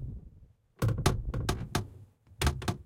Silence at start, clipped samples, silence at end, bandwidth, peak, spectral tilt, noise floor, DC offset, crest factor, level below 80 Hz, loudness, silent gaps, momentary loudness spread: 0 s; under 0.1%; 0 s; 16.5 kHz; -10 dBFS; -5 dB/octave; -58 dBFS; under 0.1%; 22 dB; -40 dBFS; -33 LUFS; none; 15 LU